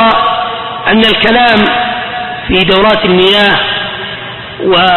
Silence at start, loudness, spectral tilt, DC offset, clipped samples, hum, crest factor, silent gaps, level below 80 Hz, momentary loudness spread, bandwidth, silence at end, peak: 0 s; -9 LUFS; -6 dB/octave; under 0.1%; 0.2%; none; 10 dB; none; -34 dBFS; 11 LU; 11 kHz; 0 s; 0 dBFS